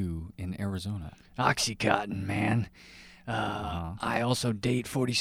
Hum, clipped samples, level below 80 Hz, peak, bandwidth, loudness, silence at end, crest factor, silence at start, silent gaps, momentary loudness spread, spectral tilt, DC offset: none; under 0.1%; -50 dBFS; -8 dBFS; 15.5 kHz; -30 LUFS; 0 s; 22 dB; 0 s; none; 13 LU; -4.5 dB/octave; under 0.1%